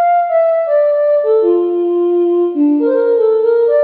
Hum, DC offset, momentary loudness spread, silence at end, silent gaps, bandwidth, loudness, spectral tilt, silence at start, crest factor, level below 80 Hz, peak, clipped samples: none; under 0.1%; 2 LU; 0 s; none; 4.4 kHz; -13 LUFS; -9 dB/octave; 0 s; 10 dB; -72 dBFS; -2 dBFS; under 0.1%